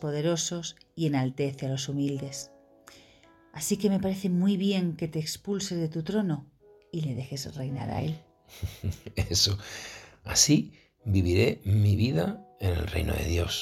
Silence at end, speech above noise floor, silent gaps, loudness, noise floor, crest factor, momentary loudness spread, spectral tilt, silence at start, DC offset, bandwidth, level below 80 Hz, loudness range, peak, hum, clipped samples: 0 s; 30 dB; none; -28 LUFS; -58 dBFS; 22 dB; 15 LU; -4.5 dB/octave; 0 s; under 0.1%; 16.5 kHz; -46 dBFS; 7 LU; -6 dBFS; none; under 0.1%